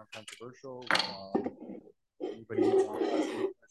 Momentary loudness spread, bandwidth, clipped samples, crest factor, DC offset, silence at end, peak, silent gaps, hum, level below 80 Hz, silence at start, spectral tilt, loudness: 19 LU; 12.5 kHz; under 0.1%; 24 dB; under 0.1%; 0.15 s; -10 dBFS; none; none; -74 dBFS; 0 s; -4 dB/octave; -32 LUFS